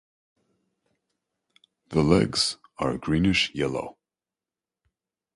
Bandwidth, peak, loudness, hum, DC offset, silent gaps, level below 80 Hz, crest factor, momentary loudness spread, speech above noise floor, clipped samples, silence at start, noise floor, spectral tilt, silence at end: 11.5 kHz; -4 dBFS; -24 LUFS; none; under 0.1%; none; -48 dBFS; 24 dB; 9 LU; over 66 dB; under 0.1%; 1.9 s; under -90 dBFS; -5 dB/octave; 1.45 s